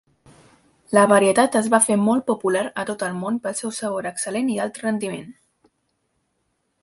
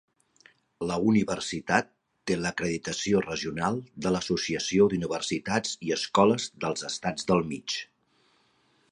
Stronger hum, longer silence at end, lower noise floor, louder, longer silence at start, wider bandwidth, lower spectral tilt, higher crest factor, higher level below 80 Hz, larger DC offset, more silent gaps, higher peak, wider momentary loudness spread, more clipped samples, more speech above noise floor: neither; first, 1.5 s vs 1.05 s; first, -72 dBFS vs -67 dBFS; first, -20 LUFS vs -28 LUFS; about the same, 0.9 s vs 0.8 s; about the same, 12 kHz vs 11.5 kHz; about the same, -4 dB/octave vs -4.5 dB/octave; about the same, 20 dB vs 24 dB; second, -66 dBFS vs -58 dBFS; neither; neither; first, -2 dBFS vs -6 dBFS; about the same, 11 LU vs 9 LU; neither; first, 51 dB vs 40 dB